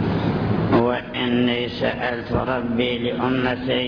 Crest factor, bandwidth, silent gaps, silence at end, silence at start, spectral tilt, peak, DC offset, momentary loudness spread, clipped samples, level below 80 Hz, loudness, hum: 16 dB; 5.4 kHz; none; 0 s; 0 s; -8.5 dB/octave; -4 dBFS; under 0.1%; 4 LU; under 0.1%; -42 dBFS; -22 LUFS; none